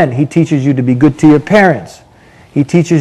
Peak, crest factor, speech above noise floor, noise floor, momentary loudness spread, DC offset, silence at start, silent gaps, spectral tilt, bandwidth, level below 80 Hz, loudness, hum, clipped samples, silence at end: 0 dBFS; 10 dB; 32 dB; -41 dBFS; 8 LU; under 0.1%; 0 s; none; -7.5 dB/octave; 10.5 kHz; -46 dBFS; -10 LUFS; none; 1%; 0 s